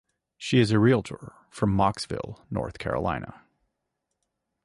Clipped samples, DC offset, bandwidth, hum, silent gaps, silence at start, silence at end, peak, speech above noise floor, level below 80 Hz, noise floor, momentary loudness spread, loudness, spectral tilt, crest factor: under 0.1%; under 0.1%; 11.5 kHz; none; none; 0.4 s; 1.35 s; -8 dBFS; 56 dB; -48 dBFS; -81 dBFS; 19 LU; -26 LUFS; -6.5 dB/octave; 20 dB